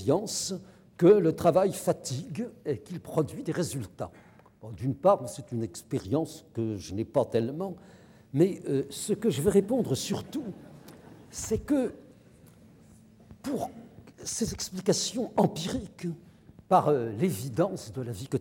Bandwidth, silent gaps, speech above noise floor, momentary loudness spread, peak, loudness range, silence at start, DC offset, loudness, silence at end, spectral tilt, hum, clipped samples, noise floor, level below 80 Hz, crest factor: 17 kHz; none; 27 dB; 14 LU; -10 dBFS; 8 LU; 0 s; under 0.1%; -29 LUFS; 0 s; -5.5 dB/octave; none; under 0.1%; -55 dBFS; -58 dBFS; 20 dB